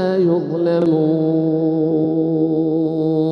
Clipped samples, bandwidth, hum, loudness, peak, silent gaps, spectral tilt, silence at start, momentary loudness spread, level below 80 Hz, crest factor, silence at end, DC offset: under 0.1%; 5.4 kHz; none; -17 LUFS; -6 dBFS; none; -10.5 dB/octave; 0 s; 2 LU; -62 dBFS; 10 dB; 0 s; under 0.1%